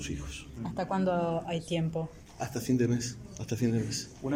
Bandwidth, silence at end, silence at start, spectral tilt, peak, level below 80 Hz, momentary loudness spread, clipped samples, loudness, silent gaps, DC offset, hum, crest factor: 16 kHz; 0 s; 0 s; -6 dB/octave; -16 dBFS; -52 dBFS; 11 LU; under 0.1%; -32 LUFS; none; under 0.1%; none; 16 dB